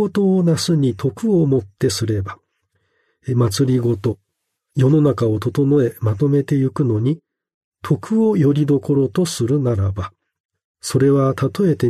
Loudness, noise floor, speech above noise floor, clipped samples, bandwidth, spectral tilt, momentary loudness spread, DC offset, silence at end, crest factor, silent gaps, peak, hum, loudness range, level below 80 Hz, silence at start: -18 LUFS; -74 dBFS; 58 dB; under 0.1%; 13.5 kHz; -7 dB/octave; 9 LU; under 0.1%; 0 s; 14 dB; 7.54-7.72 s, 10.40-10.49 s, 10.64-10.75 s; -4 dBFS; none; 2 LU; -52 dBFS; 0 s